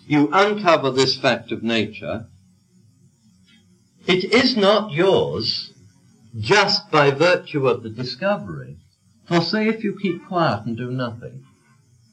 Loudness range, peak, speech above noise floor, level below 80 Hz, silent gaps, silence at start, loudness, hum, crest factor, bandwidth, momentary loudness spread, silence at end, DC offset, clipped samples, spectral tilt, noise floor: 6 LU; -2 dBFS; 36 dB; -62 dBFS; none; 0.05 s; -19 LUFS; none; 18 dB; 10 kHz; 15 LU; 0.75 s; under 0.1%; under 0.1%; -5 dB/octave; -56 dBFS